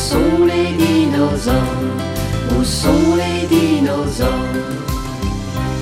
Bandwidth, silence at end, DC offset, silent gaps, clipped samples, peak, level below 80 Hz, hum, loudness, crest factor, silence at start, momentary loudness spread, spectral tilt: 16.5 kHz; 0 s; under 0.1%; none; under 0.1%; -2 dBFS; -28 dBFS; none; -16 LUFS; 14 dB; 0 s; 8 LU; -5.5 dB/octave